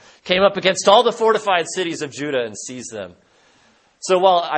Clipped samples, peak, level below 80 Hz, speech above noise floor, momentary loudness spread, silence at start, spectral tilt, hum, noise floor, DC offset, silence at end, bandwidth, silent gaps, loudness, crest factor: under 0.1%; 0 dBFS; -60 dBFS; 38 dB; 17 LU; 0.25 s; -3 dB/octave; none; -56 dBFS; under 0.1%; 0 s; 8.8 kHz; none; -17 LUFS; 18 dB